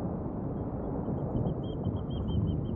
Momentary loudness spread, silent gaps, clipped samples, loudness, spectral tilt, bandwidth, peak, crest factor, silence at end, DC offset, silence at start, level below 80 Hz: 4 LU; none; under 0.1%; -34 LUFS; -12 dB/octave; 3.5 kHz; -18 dBFS; 14 dB; 0 s; under 0.1%; 0 s; -42 dBFS